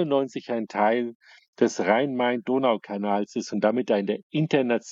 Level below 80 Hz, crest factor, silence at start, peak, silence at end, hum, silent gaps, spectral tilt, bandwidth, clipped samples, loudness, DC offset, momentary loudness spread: -76 dBFS; 18 dB; 0 s; -6 dBFS; 0 s; none; 1.15-1.20 s, 1.48-1.53 s, 4.23-4.30 s; -6 dB/octave; 7.8 kHz; under 0.1%; -25 LUFS; under 0.1%; 6 LU